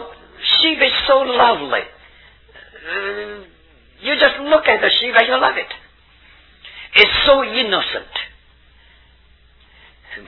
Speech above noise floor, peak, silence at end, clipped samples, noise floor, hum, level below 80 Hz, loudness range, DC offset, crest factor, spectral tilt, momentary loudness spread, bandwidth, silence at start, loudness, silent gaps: 35 dB; 0 dBFS; 0.05 s; under 0.1%; -50 dBFS; none; -46 dBFS; 5 LU; under 0.1%; 18 dB; -4.5 dB/octave; 20 LU; 5.4 kHz; 0 s; -15 LUFS; none